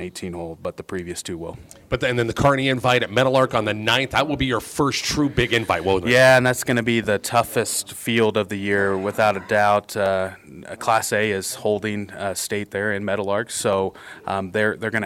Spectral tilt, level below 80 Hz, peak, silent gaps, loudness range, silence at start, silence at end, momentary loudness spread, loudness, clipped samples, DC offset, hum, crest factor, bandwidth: -4 dB/octave; -46 dBFS; -4 dBFS; none; 5 LU; 0 s; 0 s; 12 LU; -21 LUFS; under 0.1%; under 0.1%; none; 18 dB; 16.5 kHz